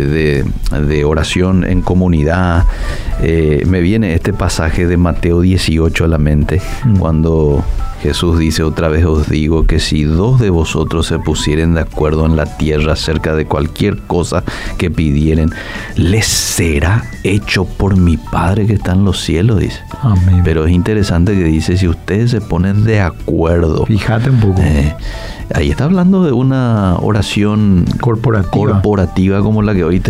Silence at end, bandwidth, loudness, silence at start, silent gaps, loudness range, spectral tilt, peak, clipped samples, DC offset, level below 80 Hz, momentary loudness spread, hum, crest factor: 0 s; 15.5 kHz; -13 LUFS; 0 s; none; 2 LU; -6.5 dB/octave; -2 dBFS; under 0.1%; under 0.1%; -20 dBFS; 5 LU; none; 10 dB